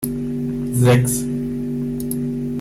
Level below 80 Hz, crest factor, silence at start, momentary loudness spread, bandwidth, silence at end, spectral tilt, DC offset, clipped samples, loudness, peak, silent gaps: -42 dBFS; 16 dB; 0 s; 9 LU; 16 kHz; 0 s; -6 dB/octave; under 0.1%; under 0.1%; -20 LUFS; -4 dBFS; none